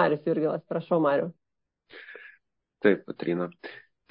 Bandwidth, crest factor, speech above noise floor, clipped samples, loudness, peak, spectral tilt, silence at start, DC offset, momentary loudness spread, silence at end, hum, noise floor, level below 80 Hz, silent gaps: 5.4 kHz; 20 dB; 38 dB; under 0.1%; -27 LUFS; -8 dBFS; -11 dB/octave; 0 s; under 0.1%; 21 LU; 0.3 s; none; -65 dBFS; -76 dBFS; none